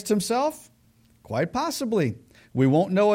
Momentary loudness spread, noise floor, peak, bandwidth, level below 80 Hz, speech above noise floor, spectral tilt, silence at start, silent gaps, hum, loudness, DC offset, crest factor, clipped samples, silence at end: 12 LU; -60 dBFS; -10 dBFS; 16.5 kHz; -60 dBFS; 37 dB; -6 dB/octave; 0 s; none; none; -25 LUFS; under 0.1%; 16 dB; under 0.1%; 0 s